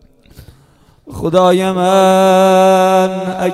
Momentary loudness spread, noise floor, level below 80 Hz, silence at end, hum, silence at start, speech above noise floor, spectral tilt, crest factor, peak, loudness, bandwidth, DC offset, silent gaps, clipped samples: 8 LU; -48 dBFS; -46 dBFS; 0 s; none; 0.4 s; 38 dB; -5.5 dB/octave; 12 dB; 0 dBFS; -11 LUFS; 15.5 kHz; under 0.1%; none; under 0.1%